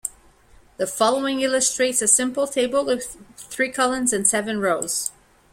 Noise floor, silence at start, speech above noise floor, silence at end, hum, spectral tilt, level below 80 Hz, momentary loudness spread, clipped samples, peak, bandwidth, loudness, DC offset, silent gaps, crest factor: -52 dBFS; 0.05 s; 31 dB; 0.45 s; none; -1.5 dB/octave; -58 dBFS; 12 LU; under 0.1%; -2 dBFS; 16.5 kHz; -21 LUFS; under 0.1%; none; 22 dB